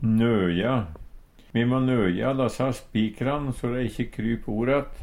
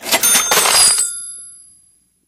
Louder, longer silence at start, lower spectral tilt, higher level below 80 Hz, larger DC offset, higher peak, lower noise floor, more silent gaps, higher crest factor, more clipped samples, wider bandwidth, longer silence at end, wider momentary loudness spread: second, -25 LUFS vs -10 LUFS; about the same, 0 s vs 0 s; first, -7.5 dB/octave vs 1.5 dB/octave; first, -42 dBFS vs -54 dBFS; neither; second, -10 dBFS vs 0 dBFS; second, -46 dBFS vs -55 dBFS; neither; about the same, 14 dB vs 16 dB; neither; second, 15 kHz vs over 20 kHz; second, 0 s vs 0.75 s; second, 7 LU vs 19 LU